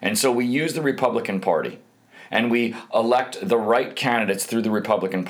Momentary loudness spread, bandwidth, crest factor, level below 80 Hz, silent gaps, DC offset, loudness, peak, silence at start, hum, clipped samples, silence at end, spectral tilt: 4 LU; over 20 kHz; 16 dB; -74 dBFS; none; under 0.1%; -22 LUFS; -6 dBFS; 0 s; none; under 0.1%; 0 s; -4 dB/octave